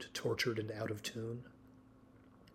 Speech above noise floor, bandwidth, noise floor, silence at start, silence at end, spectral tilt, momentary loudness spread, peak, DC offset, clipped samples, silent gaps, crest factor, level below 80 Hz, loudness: 23 dB; 16 kHz; -62 dBFS; 0 s; 0 s; -4.5 dB/octave; 12 LU; -22 dBFS; under 0.1%; under 0.1%; none; 20 dB; -72 dBFS; -40 LUFS